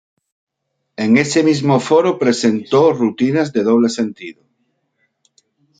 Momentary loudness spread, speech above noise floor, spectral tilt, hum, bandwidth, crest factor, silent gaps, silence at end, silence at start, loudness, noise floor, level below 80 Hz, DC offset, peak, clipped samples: 10 LU; 59 dB; -5.5 dB/octave; none; 9.4 kHz; 16 dB; none; 1.5 s; 1 s; -15 LUFS; -73 dBFS; -60 dBFS; under 0.1%; 0 dBFS; under 0.1%